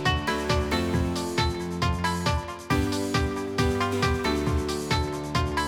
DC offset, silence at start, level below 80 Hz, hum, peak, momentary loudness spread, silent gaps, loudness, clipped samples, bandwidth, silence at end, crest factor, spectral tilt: 0.1%; 0 s; -36 dBFS; none; -10 dBFS; 3 LU; none; -26 LUFS; under 0.1%; 19.5 kHz; 0 s; 16 dB; -5 dB/octave